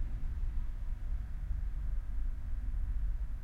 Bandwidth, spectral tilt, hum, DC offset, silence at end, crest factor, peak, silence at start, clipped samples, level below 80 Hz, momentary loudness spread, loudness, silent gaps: 2.9 kHz; -8 dB/octave; none; under 0.1%; 0 s; 10 dB; -24 dBFS; 0 s; under 0.1%; -36 dBFS; 3 LU; -42 LUFS; none